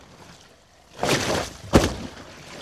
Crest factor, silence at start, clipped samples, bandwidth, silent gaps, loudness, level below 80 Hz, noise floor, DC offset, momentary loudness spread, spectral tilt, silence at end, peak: 24 dB; 0.2 s; under 0.1%; 15.5 kHz; none; -23 LUFS; -38 dBFS; -53 dBFS; under 0.1%; 19 LU; -4.5 dB/octave; 0 s; -2 dBFS